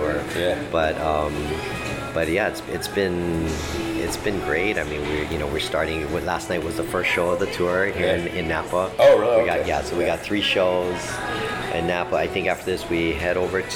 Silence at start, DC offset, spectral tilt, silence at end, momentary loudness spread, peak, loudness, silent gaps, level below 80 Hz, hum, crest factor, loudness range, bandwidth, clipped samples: 0 s; under 0.1%; -5 dB/octave; 0 s; 7 LU; -6 dBFS; -23 LUFS; none; -40 dBFS; none; 18 dB; 4 LU; 17.5 kHz; under 0.1%